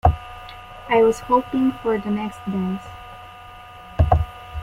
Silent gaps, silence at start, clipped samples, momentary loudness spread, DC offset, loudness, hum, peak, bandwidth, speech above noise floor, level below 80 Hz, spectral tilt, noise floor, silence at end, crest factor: none; 0.05 s; under 0.1%; 22 LU; under 0.1%; -21 LUFS; none; -2 dBFS; 14.5 kHz; 20 dB; -32 dBFS; -7.5 dB/octave; -41 dBFS; 0 s; 20 dB